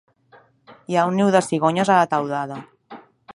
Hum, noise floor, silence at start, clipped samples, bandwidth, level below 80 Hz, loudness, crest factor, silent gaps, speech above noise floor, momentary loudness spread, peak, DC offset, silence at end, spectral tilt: none; -54 dBFS; 0.7 s; under 0.1%; 11.5 kHz; -68 dBFS; -19 LUFS; 18 dB; none; 35 dB; 11 LU; -2 dBFS; under 0.1%; 0.35 s; -5.5 dB/octave